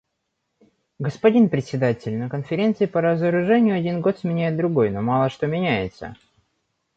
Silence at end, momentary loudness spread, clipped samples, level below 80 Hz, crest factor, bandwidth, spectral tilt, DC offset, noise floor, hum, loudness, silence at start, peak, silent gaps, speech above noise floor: 0.85 s; 9 LU; under 0.1%; -56 dBFS; 18 dB; 7.8 kHz; -8.5 dB/octave; under 0.1%; -76 dBFS; none; -21 LUFS; 1 s; -4 dBFS; none; 56 dB